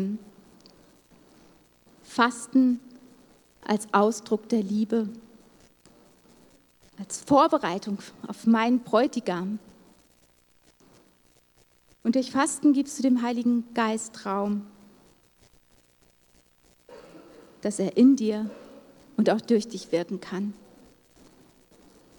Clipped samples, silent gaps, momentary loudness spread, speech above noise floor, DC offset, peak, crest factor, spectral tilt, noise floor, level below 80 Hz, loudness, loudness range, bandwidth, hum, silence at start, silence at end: under 0.1%; none; 15 LU; 38 dB; under 0.1%; -6 dBFS; 22 dB; -5 dB/octave; -62 dBFS; -70 dBFS; -25 LUFS; 7 LU; 19 kHz; none; 0 s; 1.65 s